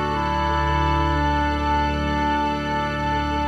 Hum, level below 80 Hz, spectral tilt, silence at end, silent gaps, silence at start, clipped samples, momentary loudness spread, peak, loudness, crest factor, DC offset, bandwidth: none; -28 dBFS; -6.5 dB/octave; 0 s; none; 0 s; under 0.1%; 3 LU; -10 dBFS; -22 LUFS; 12 dB; under 0.1%; 10 kHz